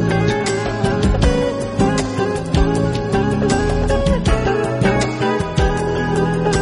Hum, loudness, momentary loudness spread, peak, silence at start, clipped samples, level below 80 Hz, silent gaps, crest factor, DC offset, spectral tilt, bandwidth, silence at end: none; -18 LUFS; 3 LU; -2 dBFS; 0 s; under 0.1%; -24 dBFS; none; 14 dB; under 0.1%; -6 dB/octave; 11 kHz; 0 s